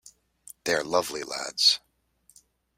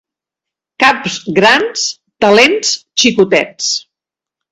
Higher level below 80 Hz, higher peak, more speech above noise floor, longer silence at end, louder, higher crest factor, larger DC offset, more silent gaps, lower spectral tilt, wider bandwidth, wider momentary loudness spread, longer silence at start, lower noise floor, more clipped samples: second, -68 dBFS vs -52 dBFS; second, -8 dBFS vs 0 dBFS; second, 39 dB vs 73 dB; first, 1 s vs 0.7 s; second, -25 LUFS vs -11 LUFS; first, 22 dB vs 14 dB; neither; neither; second, -1 dB/octave vs -2.5 dB/octave; first, 16 kHz vs 13 kHz; first, 12 LU vs 9 LU; second, 0.05 s vs 0.8 s; second, -65 dBFS vs -85 dBFS; second, under 0.1% vs 0.2%